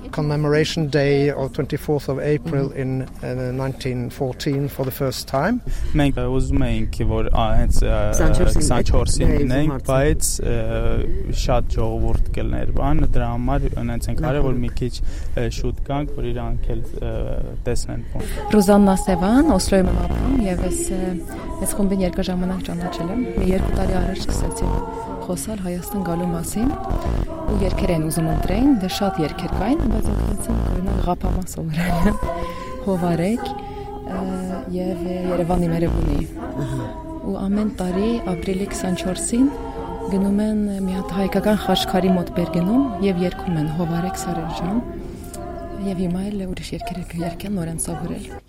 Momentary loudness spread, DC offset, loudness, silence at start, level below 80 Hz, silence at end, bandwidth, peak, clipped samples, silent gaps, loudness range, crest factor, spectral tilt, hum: 9 LU; under 0.1%; -22 LUFS; 0 s; -24 dBFS; 0.1 s; 16 kHz; -2 dBFS; under 0.1%; none; 5 LU; 18 dB; -6 dB/octave; none